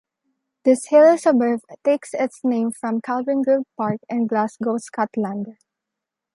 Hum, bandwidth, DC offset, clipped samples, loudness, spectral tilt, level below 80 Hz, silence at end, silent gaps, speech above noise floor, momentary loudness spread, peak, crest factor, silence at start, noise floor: none; 11.5 kHz; under 0.1%; under 0.1%; -20 LUFS; -6 dB/octave; -74 dBFS; 0.85 s; none; 65 dB; 12 LU; -4 dBFS; 16 dB; 0.65 s; -84 dBFS